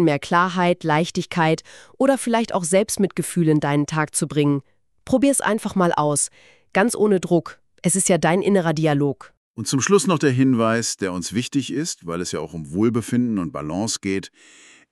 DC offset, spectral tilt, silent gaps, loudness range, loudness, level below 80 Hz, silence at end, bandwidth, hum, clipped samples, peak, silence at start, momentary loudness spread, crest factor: under 0.1%; -5 dB/octave; 9.37-9.54 s; 4 LU; -21 LUFS; -56 dBFS; 0.65 s; 13.5 kHz; none; under 0.1%; -4 dBFS; 0 s; 9 LU; 18 dB